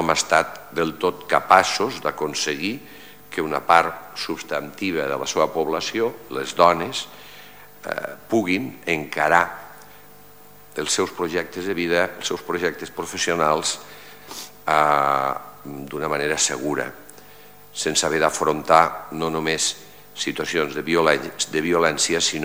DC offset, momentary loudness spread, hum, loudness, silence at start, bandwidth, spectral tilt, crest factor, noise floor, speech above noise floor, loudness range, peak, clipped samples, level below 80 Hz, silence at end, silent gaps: 0.4%; 17 LU; none; -22 LUFS; 0 s; 17 kHz; -2.5 dB/octave; 22 dB; -48 dBFS; 26 dB; 3 LU; 0 dBFS; under 0.1%; -56 dBFS; 0 s; none